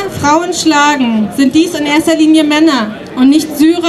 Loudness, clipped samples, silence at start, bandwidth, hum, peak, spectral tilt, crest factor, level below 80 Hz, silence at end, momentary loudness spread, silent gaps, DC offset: -10 LUFS; under 0.1%; 0 s; 13 kHz; none; 0 dBFS; -3.5 dB/octave; 10 dB; -46 dBFS; 0 s; 4 LU; none; under 0.1%